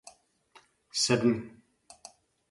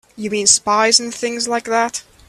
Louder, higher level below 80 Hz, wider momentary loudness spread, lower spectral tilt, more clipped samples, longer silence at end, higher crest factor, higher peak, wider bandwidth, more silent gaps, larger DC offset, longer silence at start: second, -28 LUFS vs -15 LUFS; second, -68 dBFS vs -58 dBFS; first, 25 LU vs 10 LU; first, -4 dB/octave vs -0.5 dB/octave; neither; first, 1 s vs 0.3 s; about the same, 20 dB vs 18 dB; second, -12 dBFS vs 0 dBFS; second, 11.5 kHz vs 14 kHz; neither; neither; about the same, 0.05 s vs 0.15 s